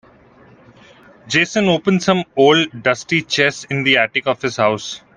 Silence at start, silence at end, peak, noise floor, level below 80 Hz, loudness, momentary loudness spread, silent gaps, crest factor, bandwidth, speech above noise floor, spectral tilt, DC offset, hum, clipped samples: 1.25 s; 0.2 s; 0 dBFS; -47 dBFS; -56 dBFS; -16 LUFS; 6 LU; none; 18 dB; 10 kHz; 31 dB; -4.5 dB/octave; under 0.1%; none; under 0.1%